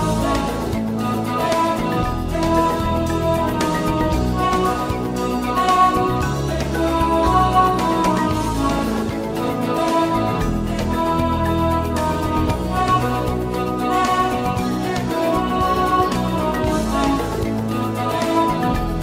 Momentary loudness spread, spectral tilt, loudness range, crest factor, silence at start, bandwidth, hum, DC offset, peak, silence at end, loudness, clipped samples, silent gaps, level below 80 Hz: 6 LU; -6 dB/octave; 2 LU; 16 dB; 0 s; 16 kHz; none; under 0.1%; -4 dBFS; 0 s; -19 LUFS; under 0.1%; none; -30 dBFS